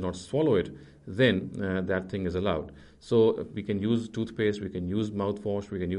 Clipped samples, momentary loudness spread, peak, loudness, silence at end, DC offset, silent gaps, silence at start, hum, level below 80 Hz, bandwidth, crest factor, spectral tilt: under 0.1%; 10 LU; -10 dBFS; -29 LUFS; 0 s; under 0.1%; none; 0 s; none; -54 dBFS; 10.5 kHz; 18 dB; -7 dB/octave